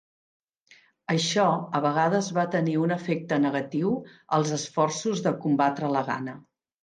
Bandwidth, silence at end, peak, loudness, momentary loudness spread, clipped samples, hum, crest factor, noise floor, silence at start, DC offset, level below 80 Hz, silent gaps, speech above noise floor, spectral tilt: 9.8 kHz; 0.4 s; -10 dBFS; -26 LUFS; 5 LU; under 0.1%; none; 16 dB; -59 dBFS; 1.1 s; under 0.1%; -74 dBFS; none; 33 dB; -5 dB/octave